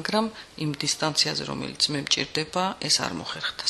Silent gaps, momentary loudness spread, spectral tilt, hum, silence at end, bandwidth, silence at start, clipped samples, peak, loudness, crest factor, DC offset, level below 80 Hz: none; 9 LU; -2.5 dB/octave; none; 0 s; 13 kHz; 0 s; under 0.1%; -6 dBFS; -25 LUFS; 20 dB; under 0.1%; -58 dBFS